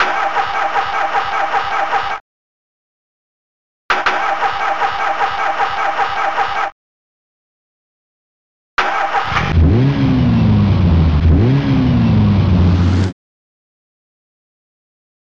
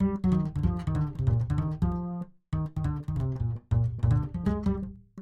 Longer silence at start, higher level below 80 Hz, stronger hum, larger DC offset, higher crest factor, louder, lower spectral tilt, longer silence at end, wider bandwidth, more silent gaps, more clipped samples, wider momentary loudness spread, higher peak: about the same, 0 s vs 0 s; first, -26 dBFS vs -38 dBFS; neither; neither; about the same, 12 dB vs 14 dB; first, -15 LUFS vs -29 LUFS; second, -7 dB/octave vs -10 dB/octave; first, 2.1 s vs 0 s; about the same, 7.4 kHz vs 7.8 kHz; first, 2.21-3.89 s, 6.72-8.77 s vs none; neither; about the same, 6 LU vs 7 LU; first, -4 dBFS vs -14 dBFS